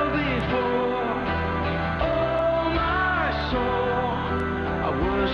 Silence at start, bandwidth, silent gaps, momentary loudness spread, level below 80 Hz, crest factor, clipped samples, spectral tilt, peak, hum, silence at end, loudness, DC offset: 0 s; 7.2 kHz; none; 3 LU; -36 dBFS; 12 dB; under 0.1%; -7.5 dB/octave; -12 dBFS; none; 0 s; -24 LUFS; under 0.1%